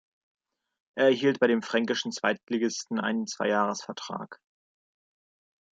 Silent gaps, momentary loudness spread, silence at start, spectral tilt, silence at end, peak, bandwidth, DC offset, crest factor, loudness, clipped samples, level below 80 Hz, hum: 2.43-2.47 s; 13 LU; 0.95 s; -4 dB/octave; 1.35 s; -8 dBFS; 9 kHz; under 0.1%; 22 dB; -27 LUFS; under 0.1%; -80 dBFS; none